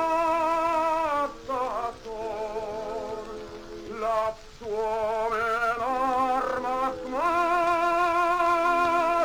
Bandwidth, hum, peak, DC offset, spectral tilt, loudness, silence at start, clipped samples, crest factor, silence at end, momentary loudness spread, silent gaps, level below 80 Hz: over 20 kHz; none; -12 dBFS; under 0.1%; -4 dB/octave; -26 LUFS; 0 s; under 0.1%; 14 dB; 0 s; 11 LU; none; -50 dBFS